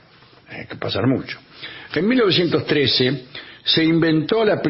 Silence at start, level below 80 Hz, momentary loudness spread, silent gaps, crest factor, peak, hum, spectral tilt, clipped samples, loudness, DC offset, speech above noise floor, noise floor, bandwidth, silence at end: 0.5 s; -56 dBFS; 18 LU; none; 14 dB; -6 dBFS; none; -9.5 dB/octave; under 0.1%; -18 LUFS; under 0.1%; 30 dB; -49 dBFS; 5.8 kHz; 0 s